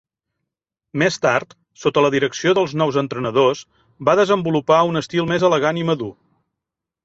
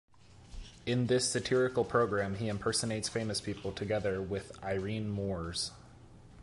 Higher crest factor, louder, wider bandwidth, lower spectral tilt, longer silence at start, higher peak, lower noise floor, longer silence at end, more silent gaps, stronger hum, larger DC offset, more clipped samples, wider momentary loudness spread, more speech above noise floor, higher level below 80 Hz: about the same, 18 dB vs 18 dB; first, -18 LUFS vs -33 LUFS; second, 8 kHz vs 11.5 kHz; about the same, -5.5 dB/octave vs -4.5 dB/octave; first, 0.95 s vs 0.25 s; first, -2 dBFS vs -16 dBFS; first, -84 dBFS vs -55 dBFS; first, 0.95 s vs 0 s; neither; neither; neither; neither; about the same, 7 LU vs 9 LU; first, 66 dB vs 22 dB; about the same, -58 dBFS vs -54 dBFS